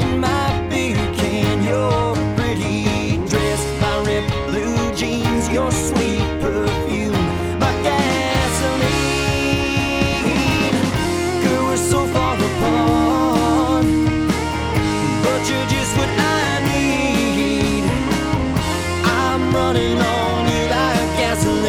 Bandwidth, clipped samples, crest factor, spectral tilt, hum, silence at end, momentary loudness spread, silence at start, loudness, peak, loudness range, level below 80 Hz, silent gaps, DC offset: 16.5 kHz; under 0.1%; 16 dB; -5 dB/octave; none; 0 s; 3 LU; 0 s; -18 LUFS; -2 dBFS; 2 LU; -32 dBFS; none; under 0.1%